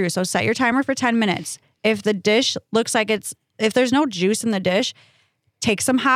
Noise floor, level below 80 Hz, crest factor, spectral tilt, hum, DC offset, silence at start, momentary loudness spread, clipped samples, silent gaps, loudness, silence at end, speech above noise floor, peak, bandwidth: -59 dBFS; -62 dBFS; 16 dB; -3.5 dB/octave; none; under 0.1%; 0 s; 6 LU; under 0.1%; none; -20 LUFS; 0 s; 39 dB; -4 dBFS; 15.5 kHz